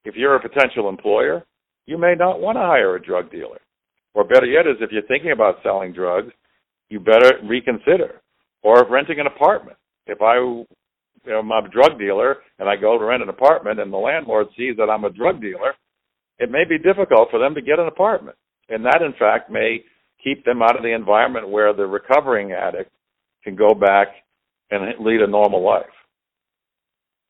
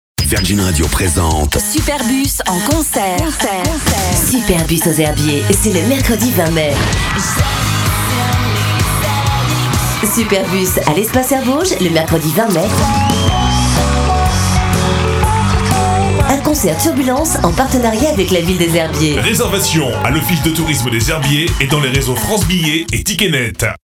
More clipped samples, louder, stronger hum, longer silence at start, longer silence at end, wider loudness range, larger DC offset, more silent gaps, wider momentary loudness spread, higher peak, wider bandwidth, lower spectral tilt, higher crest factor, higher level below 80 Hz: neither; second, -17 LUFS vs -13 LUFS; neither; second, 0.05 s vs 0.2 s; first, 1.45 s vs 0.15 s; about the same, 3 LU vs 1 LU; neither; neither; first, 11 LU vs 2 LU; about the same, 0 dBFS vs 0 dBFS; second, 7 kHz vs 17.5 kHz; first, -6 dB/octave vs -4 dB/octave; about the same, 18 dB vs 14 dB; second, -60 dBFS vs -24 dBFS